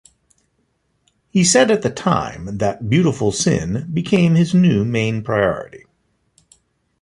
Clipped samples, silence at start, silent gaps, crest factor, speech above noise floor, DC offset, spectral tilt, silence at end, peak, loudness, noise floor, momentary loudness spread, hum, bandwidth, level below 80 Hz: under 0.1%; 1.35 s; none; 16 dB; 50 dB; under 0.1%; -5 dB/octave; 1.25 s; -2 dBFS; -17 LUFS; -66 dBFS; 9 LU; none; 11 kHz; -46 dBFS